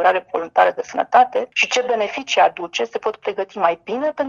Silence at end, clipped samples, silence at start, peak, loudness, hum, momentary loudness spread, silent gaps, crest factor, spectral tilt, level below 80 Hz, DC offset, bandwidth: 0 s; under 0.1%; 0 s; -2 dBFS; -19 LUFS; none; 9 LU; none; 18 dB; -2 dB/octave; -66 dBFS; under 0.1%; 7.6 kHz